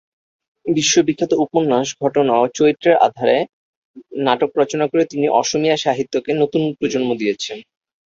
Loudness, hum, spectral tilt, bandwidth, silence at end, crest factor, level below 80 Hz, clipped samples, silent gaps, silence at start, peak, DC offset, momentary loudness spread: -17 LUFS; none; -4 dB/octave; 7.8 kHz; 0.45 s; 16 dB; -60 dBFS; under 0.1%; 3.49-3.94 s; 0.65 s; -2 dBFS; under 0.1%; 7 LU